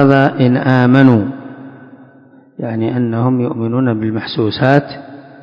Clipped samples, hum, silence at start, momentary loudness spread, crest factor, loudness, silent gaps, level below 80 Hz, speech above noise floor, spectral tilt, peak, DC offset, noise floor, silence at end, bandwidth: 0.5%; none; 0 s; 19 LU; 14 dB; -13 LUFS; none; -52 dBFS; 31 dB; -9 dB/octave; 0 dBFS; under 0.1%; -44 dBFS; 0.15 s; 5.8 kHz